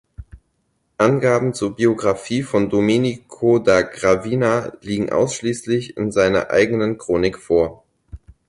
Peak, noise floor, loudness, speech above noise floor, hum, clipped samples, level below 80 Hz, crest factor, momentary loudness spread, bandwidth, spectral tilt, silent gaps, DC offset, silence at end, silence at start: -2 dBFS; -68 dBFS; -19 LUFS; 50 dB; none; under 0.1%; -46 dBFS; 16 dB; 6 LU; 11.5 kHz; -6 dB/octave; none; under 0.1%; 0.3 s; 0.2 s